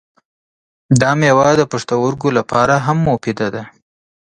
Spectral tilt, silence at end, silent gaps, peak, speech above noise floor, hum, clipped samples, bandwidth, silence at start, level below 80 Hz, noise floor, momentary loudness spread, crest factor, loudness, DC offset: -6 dB/octave; 0.55 s; none; 0 dBFS; over 76 dB; none; under 0.1%; 10 kHz; 0.9 s; -48 dBFS; under -90 dBFS; 9 LU; 16 dB; -15 LUFS; under 0.1%